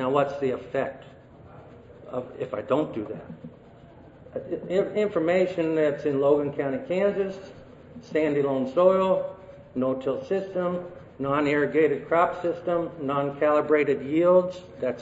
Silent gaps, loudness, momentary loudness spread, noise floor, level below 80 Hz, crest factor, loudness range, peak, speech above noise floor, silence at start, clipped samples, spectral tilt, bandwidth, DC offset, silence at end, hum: none; -25 LUFS; 15 LU; -49 dBFS; -62 dBFS; 18 dB; 8 LU; -8 dBFS; 24 dB; 0 s; under 0.1%; -7.5 dB/octave; 7.8 kHz; under 0.1%; 0 s; none